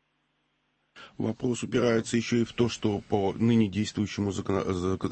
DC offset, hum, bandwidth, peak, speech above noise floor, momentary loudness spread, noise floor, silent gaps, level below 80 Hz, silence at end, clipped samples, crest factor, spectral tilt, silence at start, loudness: under 0.1%; none; 8.8 kHz; -12 dBFS; 47 dB; 6 LU; -74 dBFS; none; -56 dBFS; 0 s; under 0.1%; 16 dB; -6 dB/octave; 0.95 s; -28 LUFS